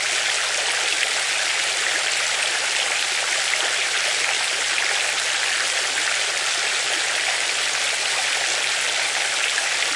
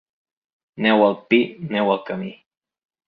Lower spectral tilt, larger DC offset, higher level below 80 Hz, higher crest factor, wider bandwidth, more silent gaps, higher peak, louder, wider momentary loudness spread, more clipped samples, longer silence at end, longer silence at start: second, 2.5 dB/octave vs -8.5 dB/octave; neither; second, -74 dBFS vs -68 dBFS; about the same, 16 dB vs 20 dB; first, 11.5 kHz vs 5 kHz; neither; second, -6 dBFS vs -2 dBFS; about the same, -19 LUFS vs -20 LUFS; second, 1 LU vs 13 LU; neither; second, 0 s vs 0.75 s; second, 0 s vs 0.75 s